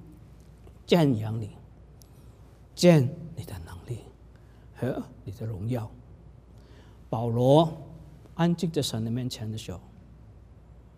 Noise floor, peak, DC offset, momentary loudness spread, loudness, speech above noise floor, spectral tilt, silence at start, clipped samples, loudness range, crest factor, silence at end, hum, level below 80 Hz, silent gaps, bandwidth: -51 dBFS; -6 dBFS; under 0.1%; 22 LU; -26 LUFS; 26 dB; -6.5 dB/octave; 0 s; under 0.1%; 10 LU; 24 dB; 0.15 s; none; -54 dBFS; none; 15.5 kHz